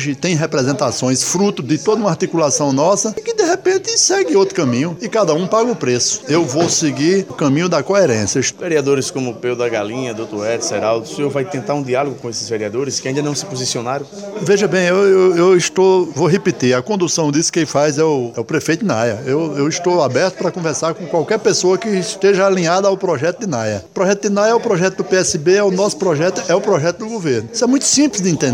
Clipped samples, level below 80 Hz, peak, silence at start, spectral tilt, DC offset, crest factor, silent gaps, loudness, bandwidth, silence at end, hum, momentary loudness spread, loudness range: under 0.1%; -58 dBFS; -2 dBFS; 0 s; -4 dB/octave; under 0.1%; 14 dB; none; -16 LUFS; 14.5 kHz; 0 s; none; 8 LU; 5 LU